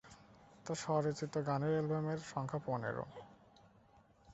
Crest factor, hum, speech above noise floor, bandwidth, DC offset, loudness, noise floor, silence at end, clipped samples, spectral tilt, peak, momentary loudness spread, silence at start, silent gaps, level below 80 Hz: 18 dB; none; 29 dB; 8 kHz; under 0.1%; -39 LUFS; -67 dBFS; 0 s; under 0.1%; -6.5 dB/octave; -22 dBFS; 15 LU; 0.05 s; none; -72 dBFS